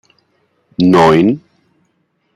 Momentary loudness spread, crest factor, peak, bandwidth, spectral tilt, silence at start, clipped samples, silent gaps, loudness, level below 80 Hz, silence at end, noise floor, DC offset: 16 LU; 14 dB; 0 dBFS; 12 kHz; -7 dB/octave; 0.8 s; under 0.1%; none; -11 LUFS; -48 dBFS; 1 s; -63 dBFS; under 0.1%